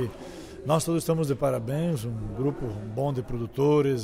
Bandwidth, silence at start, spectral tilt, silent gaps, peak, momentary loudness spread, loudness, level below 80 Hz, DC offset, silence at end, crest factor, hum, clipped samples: 16 kHz; 0 s; -7 dB/octave; none; -10 dBFS; 11 LU; -28 LUFS; -48 dBFS; under 0.1%; 0 s; 16 dB; none; under 0.1%